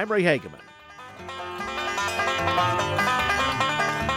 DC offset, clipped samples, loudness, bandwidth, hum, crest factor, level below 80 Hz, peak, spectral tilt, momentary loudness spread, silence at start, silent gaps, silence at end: under 0.1%; under 0.1%; -24 LUFS; 17 kHz; none; 18 dB; -50 dBFS; -8 dBFS; -4 dB/octave; 17 LU; 0 s; none; 0 s